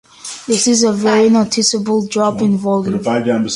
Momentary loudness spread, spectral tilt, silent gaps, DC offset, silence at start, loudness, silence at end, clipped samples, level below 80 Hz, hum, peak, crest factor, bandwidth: 6 LU; -4 dB/octave; none; under 0.1%; 0.25 s; -14 LUFS; 0 s; under 0.1%; -54 dBFS; none; -2 dBFS; 12 dB; 11.5 kHz